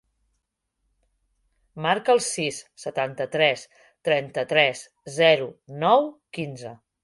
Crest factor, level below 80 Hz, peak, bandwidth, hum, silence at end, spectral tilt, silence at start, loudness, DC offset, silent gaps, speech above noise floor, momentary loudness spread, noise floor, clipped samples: 22 dB; -68 dBFS; -4 dBFS; 11.5 kHz; none; 0.3 s; -3.5 dB/octave; 1.75 s; -23 LUFS; under 0.1%; none; 54 dB; 15 LU; -77 dBFS; under 0.1%